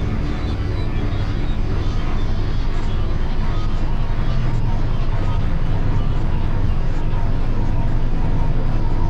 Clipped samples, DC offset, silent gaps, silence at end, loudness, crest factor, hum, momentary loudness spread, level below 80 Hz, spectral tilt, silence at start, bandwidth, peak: under 0.1%; under 0.1%; none; 0 s; -23 LUFS; 10 dB; none; 2 LU; -18 dBFS; -8 dB/octave; 0 s; 5.6 kHz; -6 dBFS